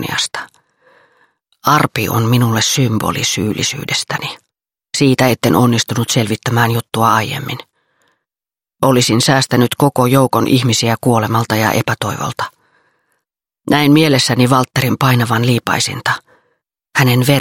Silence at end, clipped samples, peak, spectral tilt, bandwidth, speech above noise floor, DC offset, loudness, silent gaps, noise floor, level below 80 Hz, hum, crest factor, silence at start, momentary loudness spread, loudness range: 0 s; under 0.1%; 0 dBFS; -4.5 dB/octave; 17 kHz; over 77 dB; under 0.1%; -14 LUFS; none; under -90 dBFS; -50 dBFS; none; 14 dB; 0 s; 9 LU; 3 LU